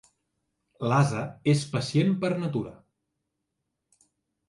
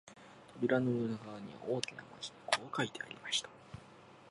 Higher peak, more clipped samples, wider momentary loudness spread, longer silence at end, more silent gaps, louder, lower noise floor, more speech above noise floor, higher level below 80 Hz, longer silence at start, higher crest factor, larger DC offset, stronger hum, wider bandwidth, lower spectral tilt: about the same, -10 dBFS vs -12 dBFS; neither; second, 9 LU vs 22 LU; first, 1.75 s vs 0 s; neither; first, -26 LUFS vs -37 LUFS; first, -82 dBFS vs -58 dBFS; first, 56 dB vs 20 dB; first, -66 dBFS vs -74 dBFS; first, 0.8 s vs 0.05 s; second, 18 dB vs 28 dB; neither; neither; about the same, 11.5 kHz vs 11.5 kHz; first, -6.5 dB/octave vs -4 dB/octave